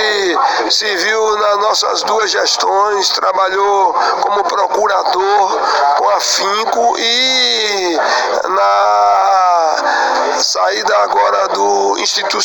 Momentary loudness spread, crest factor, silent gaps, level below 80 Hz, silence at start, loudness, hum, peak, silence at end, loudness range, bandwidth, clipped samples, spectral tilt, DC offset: 3 LU; 12 dB; none; -56 dBFS; 0 s; -12 LUFS; none; 0 dBFS; 0 s; 1 LU; 18 kHz; under 0.1%; 0 dB/octave; under 0.1%